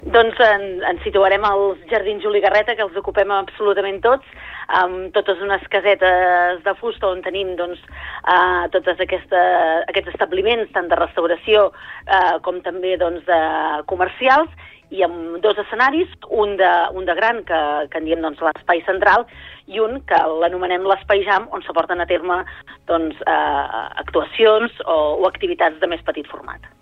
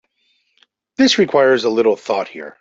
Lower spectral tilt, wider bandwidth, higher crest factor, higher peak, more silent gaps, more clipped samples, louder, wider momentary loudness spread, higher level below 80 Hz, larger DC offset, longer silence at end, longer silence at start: first, -5.5 dB/octave vs -4 dB/octave; second, 6.4 kHz vs 8 kHz; about the same, 16 dB vs 14 dB; about the same, -2 dBFS vs -2 dBFS; neither; neither; second, -18 LUFS vs -15 LUFS; second, 9 LU vs 12 LU; first, -46 dBFS vs -62 dBFS; neither; about the same, 0.15 s vs 0.1 s; second, 0 s vs 1 s